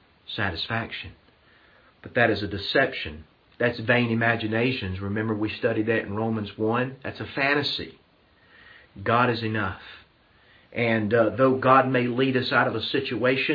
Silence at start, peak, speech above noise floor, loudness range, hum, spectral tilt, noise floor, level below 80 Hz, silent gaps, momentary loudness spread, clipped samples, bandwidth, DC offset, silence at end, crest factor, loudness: 0.3 s; -4 dBFS; 35 dB; 5 LU; none; -8 dB/octave; -59 dBFS; -58 dBFS; none; 12 LU; under 0.1%; 5.2 kHz; under 0.1%; 0 s; 20 dB; -24 LUFS